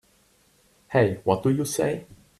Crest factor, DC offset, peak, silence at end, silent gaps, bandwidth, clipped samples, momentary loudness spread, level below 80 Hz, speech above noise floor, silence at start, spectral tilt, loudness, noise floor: 20 dB; under 0.1%; -6 dBFS; 0.35 s; none; 14 kHz; under 0.1%; 5 LU; -60 dBFS; 39 dB; 0.9 s; -6 dB/octave; -24 LUFS; -62 dBFS